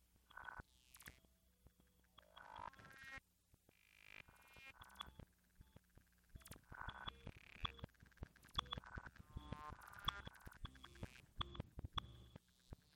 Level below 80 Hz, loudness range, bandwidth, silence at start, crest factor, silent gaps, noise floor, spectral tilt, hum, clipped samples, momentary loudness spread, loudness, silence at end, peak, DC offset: -64 dBFS; 10 LU; 16.5 kHz; 0 s; 30 dB; none; -77 dBFS; -4 dB/octave; none; under 0.1%; 17 LU; -54 LUFS; 0 s; -26 dBFS; under 0.1%